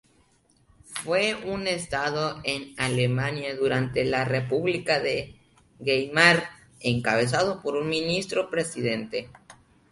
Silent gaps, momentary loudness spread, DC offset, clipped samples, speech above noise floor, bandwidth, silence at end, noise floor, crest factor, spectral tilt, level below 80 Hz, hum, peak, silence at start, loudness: none; 8 LU; under 0.1%; under 0.1%; 38 dB; 11.5 kHz; 0.4 s; -63 dBFS; 24 dB; -4.5 dB/octave; -56 dBFS; none; -4 dBFS; 0.9 s; -25 LUFS